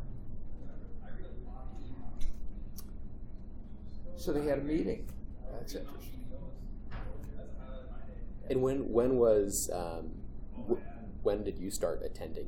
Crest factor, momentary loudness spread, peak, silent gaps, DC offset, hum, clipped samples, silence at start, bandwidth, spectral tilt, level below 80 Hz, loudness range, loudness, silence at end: 20 dB; 19 LU; -16 dBFS; none; under 0.1%; none; under 0.1%; 0 s; 17 kHz; -5.5 dB/octave; -42 dBFS; 15 LU; -35 LUFS; 0 s